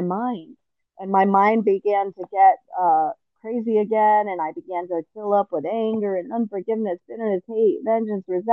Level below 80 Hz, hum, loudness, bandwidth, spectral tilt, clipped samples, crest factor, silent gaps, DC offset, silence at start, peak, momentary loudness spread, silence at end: -78 dBFS; none; -22 LUFS; 5.8 kHz; -9.5 dB/octave; under 0.1%; 16 dB; none; under 0.1%; 0 s; -4 dBFS; 11 LU; 0 s